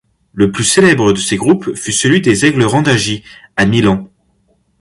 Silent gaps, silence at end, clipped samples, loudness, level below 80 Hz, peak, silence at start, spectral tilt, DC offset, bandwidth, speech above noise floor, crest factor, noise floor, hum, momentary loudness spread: none; 0.75 s; under 0.1%; -12 LUFS; -42 dBFS; 0 dBFS; 0.35 s; -4.5 dB/octave; under 0.1%; 11.5 kHz; 46 dB; 12 dB; -57 dBFS; none; 9 LU